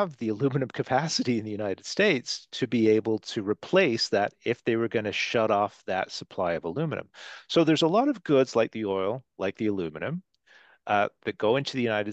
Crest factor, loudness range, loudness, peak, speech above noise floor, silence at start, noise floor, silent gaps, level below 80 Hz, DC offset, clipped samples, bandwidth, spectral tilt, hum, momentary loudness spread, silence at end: 18 dB; 3 LU; -27 LUFS; -10 dBFS; 32 dB; 0 s; -58 dBFS; none; -72 dBFS; under 0.1%; under 0.1%; 8.6 kHz; -5 dB/octave; none; 9 LU; 0 s